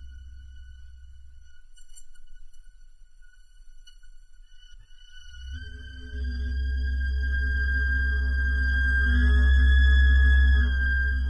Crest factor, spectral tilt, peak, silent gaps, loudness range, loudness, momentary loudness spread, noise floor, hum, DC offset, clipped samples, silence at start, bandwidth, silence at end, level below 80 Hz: 14 dB; -6.5 dB/octave; -12 dBFS; none; 22 LU; -24 LUFS; 20 LU; -48 dBFS; none; under 0.1%; under 0.1%; 0 s; 5.4 kHz; 0 s; -26 dBFS